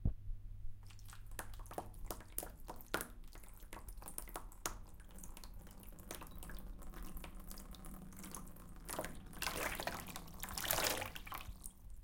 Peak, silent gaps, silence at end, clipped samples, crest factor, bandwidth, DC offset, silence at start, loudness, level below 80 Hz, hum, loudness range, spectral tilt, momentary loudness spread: -14 dBFS; none; 0 s; under 0.1%; 32 dB; 17 kHz; under 0.1%; 0 s; -46 LUFS; -52 dBFS; none; 11 LU; -3 dB/octave; 16 LU